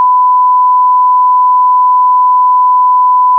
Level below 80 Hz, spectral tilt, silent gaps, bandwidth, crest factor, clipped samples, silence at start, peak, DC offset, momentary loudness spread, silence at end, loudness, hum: under -90 dBFS; -4 dB/octave; none; 1.1 kHz; 4 dB; under 0.1%; 0 s; -4 dBFS; under 0.1%; 0 LU; 0 s; -7 LUFS; none